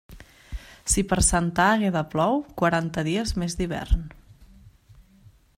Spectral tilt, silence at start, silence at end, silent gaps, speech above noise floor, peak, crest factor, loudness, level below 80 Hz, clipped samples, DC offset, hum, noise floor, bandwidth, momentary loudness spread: -4.5 dB/octave; 0.1 s; 0.6 s; none; 31 dB; -6 dBFS; 20 dB; -24 LUFS; -34 dBFS; under 0.1%; under 0.1%; none; -54 dBFS; 16 kHz; 15 LU